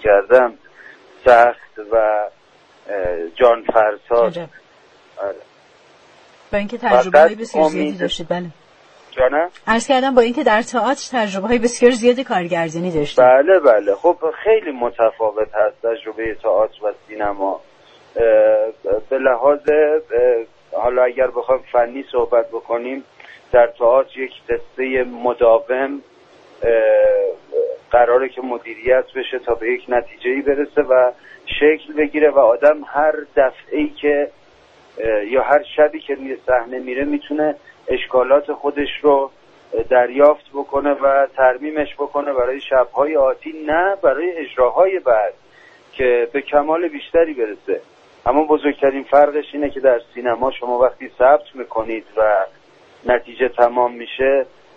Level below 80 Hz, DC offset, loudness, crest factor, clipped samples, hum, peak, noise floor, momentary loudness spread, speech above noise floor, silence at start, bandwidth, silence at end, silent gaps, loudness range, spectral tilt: -48 dBFS; under 0.1%; -17 LUFS; 16 dB; under 0.1%; none; 0 dBFS; -51 dBFS; 11 LU; 34 dB; 0 s; 8.8 kHz; 0.3 s; none; 4 LU; -5 dB/octave